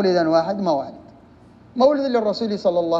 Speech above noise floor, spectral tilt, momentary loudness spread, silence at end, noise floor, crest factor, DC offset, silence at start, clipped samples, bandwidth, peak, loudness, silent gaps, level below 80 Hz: 29 dB; -6.5 dB/octave; 8 LU; 0 s; -48 dBFS; 16 dB; under 0.1%; 0 s; under 0.1%; 7.6 kHz; -4 dBFS; -20 LUFS; none; -60 dBFS